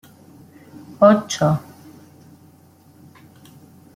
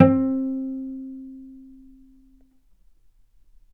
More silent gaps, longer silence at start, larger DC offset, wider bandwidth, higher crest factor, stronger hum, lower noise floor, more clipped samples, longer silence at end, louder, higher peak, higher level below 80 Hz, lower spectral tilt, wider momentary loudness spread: neither; first, 1 s vs 0 s; neither; first, 16 kHz vs 3.4 kHz; second, 20 dB vs 26 dB; neither; second, -50 dBFS vs -57 dBFS; neither; first, 2.35 s vs 2.1 s; first, -17 LUFS vs -25 LUFS; about the same, -2 dBFS vs 0 dBFS; about the same, -60 dBFS vs -58 dBFS; second, -6 dB/octave vs -11.5 dB/octave; second, 13 LU vs 24 LU